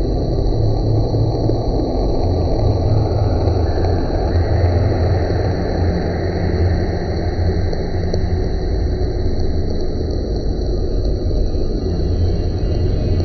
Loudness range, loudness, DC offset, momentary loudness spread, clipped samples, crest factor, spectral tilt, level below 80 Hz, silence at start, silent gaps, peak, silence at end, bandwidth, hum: 4 LU; -19 LUFS; under 0.1%; 5 LU; under 0.1%; 12 dB; -8.5 dB/octave; -20 dBFS; 0 s; none; -4 dBFS; 0 s; 6.2 kHz; none